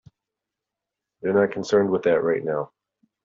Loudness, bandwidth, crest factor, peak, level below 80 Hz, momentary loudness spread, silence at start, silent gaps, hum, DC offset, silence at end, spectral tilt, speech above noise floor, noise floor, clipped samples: -23 LUFS; 7.6 kHz; 18 dB; -6 dBFS; -68 dBFS; 9 LU; 1.25 s; none; none; under 0.1%; 0.6 s; -5.5 dB/octave; 65 dB; -86 dBFS; under 0.1%